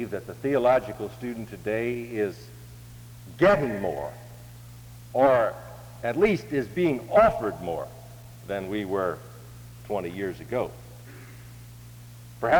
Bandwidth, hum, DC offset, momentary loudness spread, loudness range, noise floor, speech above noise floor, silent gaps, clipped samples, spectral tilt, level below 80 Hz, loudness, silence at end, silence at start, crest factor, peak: over 20 kHz; none; under 0.1%; 24 LU; 8 LU; -45 dBFS; 19 dB; none; under 0.1%; -6.5 dB/octave; -52 dBFS; -26 LUFS; 0 s; 0 s; 18 dB; -8 dBFS